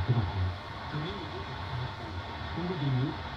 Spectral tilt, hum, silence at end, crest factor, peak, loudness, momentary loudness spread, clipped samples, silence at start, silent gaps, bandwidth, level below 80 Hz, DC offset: -7.5 dB/octave; none; 0 s; 18 dB; -16 dBFS; -34 LUFS; 8 LU; under 0.1%; 0 s; none; 7.4 kHz; -50 dBFS; under 0.1%